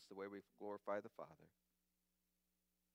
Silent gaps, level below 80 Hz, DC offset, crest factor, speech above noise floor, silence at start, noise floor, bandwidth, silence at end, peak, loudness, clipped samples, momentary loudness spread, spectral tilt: none; under -90 dBFS; under 0.1%; 22 dB; 37 dB; 0 s; -88 dBFS; 15.5 kHz; 1.45 s; -32 dBFS; -52 LUFS; under 0.1%; 11 LU; -6 dB/octave